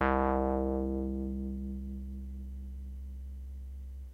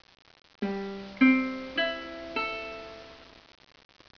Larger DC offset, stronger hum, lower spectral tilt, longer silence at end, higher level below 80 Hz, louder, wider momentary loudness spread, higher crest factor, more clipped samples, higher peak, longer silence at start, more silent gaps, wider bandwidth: neither; neither; first, -9.5 dB/octave vs -6 dB/octave; second, 0 s vs 0.9 s; first, -40 dBFS vs -62 dBFS; second, -36 LUFS vs -29 LUFS; second, 15 LU vs 22 LU; about the same, 22 dB vs 22 dB; neither; about the same, -12 dBFS vs -10 dBFS; second, 0 s vs 0.6 s; neither; second, 4.1 kHz vs 5.4 kHz